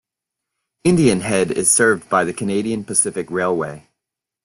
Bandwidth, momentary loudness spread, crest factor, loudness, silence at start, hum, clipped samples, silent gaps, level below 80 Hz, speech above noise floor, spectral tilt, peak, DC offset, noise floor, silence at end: 12.5 kHz; 8 LU; 16 dB; -17 LUFS; 0.85 s; none; under 0.1%; none; -52 dBFS; 66 dB; -4 dB/octave; -2 dBFS; under 0.1%; -83 dBFS; 0.65 s